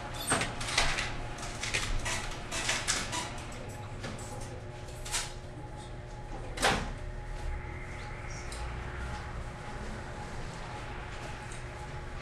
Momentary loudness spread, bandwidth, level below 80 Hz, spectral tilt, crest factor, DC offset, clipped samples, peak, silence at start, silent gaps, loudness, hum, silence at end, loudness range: 13 LU; 13 kHz; -42 dBFS; -2.5 dB/octave; 26 dB; under 0.1%; under 0.1%; -10 dBFS; 0 s; none; -36 LUFS; none; 0 s; 8 LU